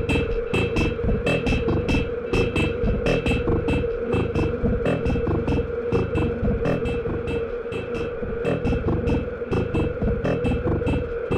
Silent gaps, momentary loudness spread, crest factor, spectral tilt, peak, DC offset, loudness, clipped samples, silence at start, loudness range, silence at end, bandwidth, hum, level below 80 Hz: none; 4 LU; 12 dB; -7.5 dB/octave; -10 dBFS; under 0.1%; -24 LUFS; under 0.1%; 0 s; 3 LU; 0 s; 11 kHz; none; -32 dBFS